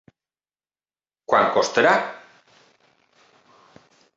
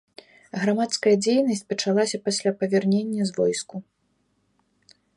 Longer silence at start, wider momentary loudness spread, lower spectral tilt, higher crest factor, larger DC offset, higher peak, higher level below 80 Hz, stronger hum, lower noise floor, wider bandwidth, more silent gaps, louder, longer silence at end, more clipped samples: first, 1.3 s vs 0.55 s; first, 23 LU vs 9 LU; about the same, -3.5 dB/octave vs -4.5 dB/octave; first, 22 dB vs 16 dB; neither; first, -4 dBFS vs -8 dBFS; about the same, -70 dBFS vs -72 dBFS; neither; first, under -90 dBFS vs -70 dBFS; second, 8.2 kHz vs 11.5 kHz; neither; first, -19 LUFS vs -23 LUFS; first, 2 s vs 1.35 s; neither